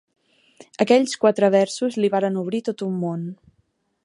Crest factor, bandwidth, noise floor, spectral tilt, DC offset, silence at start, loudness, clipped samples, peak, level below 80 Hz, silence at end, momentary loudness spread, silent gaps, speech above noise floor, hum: 20 dB; 11.5 kHz; -68 dBFS; -5.5 dB/octave; under 0.1%; 0.8 s; -21 LUFS; under 0.1%; -2 dBFS; -70 dBFS; 0.7 s; 10 LU; none; 47 dB; none